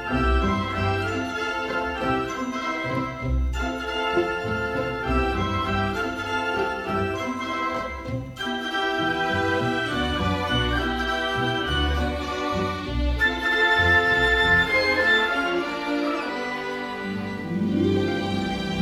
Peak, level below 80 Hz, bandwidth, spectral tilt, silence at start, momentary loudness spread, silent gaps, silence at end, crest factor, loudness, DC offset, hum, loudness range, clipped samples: -8 dBFS; -34 dBFS; 14.5 kHz; -5.5 dB/octave; 0 s; 10 LU; none; 0 s; 16 dB; -24 LUFS; under 0.1%; none; 6 LU; under 0.1%